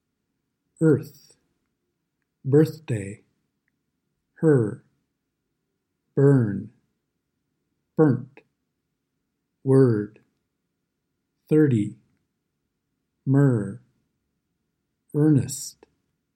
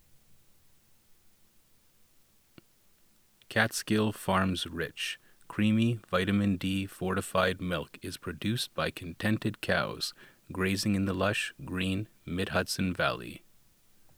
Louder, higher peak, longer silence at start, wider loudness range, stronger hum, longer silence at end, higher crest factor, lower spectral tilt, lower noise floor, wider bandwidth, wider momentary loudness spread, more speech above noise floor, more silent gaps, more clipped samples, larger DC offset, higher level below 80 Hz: first, -22 LUFS vs -31 LUFS; first, -6 dBFS vs -10 dBFS; first, 0.8 s vs 0.15 s; about the same, 4 LU vs 3 LU; neither; second, 0.65 s vs 0.8 s; about the same, 20 dB vs 24 dB; first, -8 dB/octave vs -5 dB/octave; first, -79 dBFS vs -64 dBFS; second, 13.5 kHz vs over 20 kHz; first, 16 LU vs 8 LU; first, 58 dB vs 33 dB; neither; neither; neither; second, -68 dBFS vs -60 dBFS